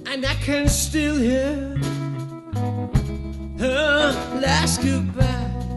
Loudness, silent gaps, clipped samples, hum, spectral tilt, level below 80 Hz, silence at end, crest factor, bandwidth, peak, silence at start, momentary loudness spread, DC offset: -22 LUFS; none; under 0.1%; none; -4.5 dB/octave; -30 dBFS; 0 s; 18 dB; 12.5 kHz; -4 dBFS; 0 s; 10 LU; under 0.1%